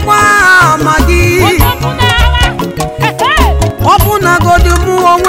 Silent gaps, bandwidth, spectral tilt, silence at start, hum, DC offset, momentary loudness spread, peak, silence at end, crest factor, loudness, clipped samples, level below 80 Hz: none; 16.5 kHz; -4.5 dB/octave; 0 s; none; under 0.1%; 7 LU; 0 dBFS; 0 s; 8 dB; -8 LUFS; 2%; -14 dBFS